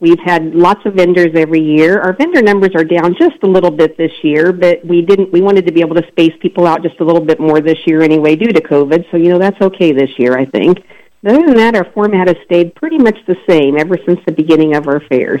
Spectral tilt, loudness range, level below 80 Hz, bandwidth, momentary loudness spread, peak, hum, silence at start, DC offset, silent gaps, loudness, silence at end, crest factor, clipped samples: -7.5 dB/octave; 1 LU; -50 dBFS; 9 kHz; 4 LU; 0 dBFS; none; 0 s; under 0.1%; none; -10 LUFS; 0 s; 10 dB; under 0.1%